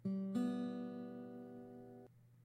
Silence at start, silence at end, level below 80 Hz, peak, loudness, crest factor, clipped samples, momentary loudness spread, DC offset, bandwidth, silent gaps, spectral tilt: 0 s; 0 s; -84 dBFS; -30 dBFS; -44 LUFS; 16 dB; under 0.1%; 19 LU; under 0.1%; 12 kHz; none; -8.5 dB/octave